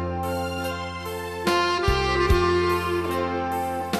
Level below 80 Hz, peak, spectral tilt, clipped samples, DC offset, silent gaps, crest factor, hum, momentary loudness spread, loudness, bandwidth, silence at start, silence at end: -36 dBFS; -8 dBFS; -5.5 dB/octave; under 0.1%; under 0.1%; none; 16 dB; none; 10 LU; -24 LUFS; 14 kHz; 0 s; 0 s